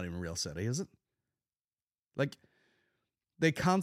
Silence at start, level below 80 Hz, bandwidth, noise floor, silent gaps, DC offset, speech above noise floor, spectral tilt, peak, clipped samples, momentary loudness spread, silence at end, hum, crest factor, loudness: 0 s; -62 dBFS; 16 kHz; under -90 dBFS; none; under 0.1%; over 57 dB; -5 dB/octave; -14 dBFS; under 0.1%; 12 LU; 0 s; none; 22 dB; -34 LUFS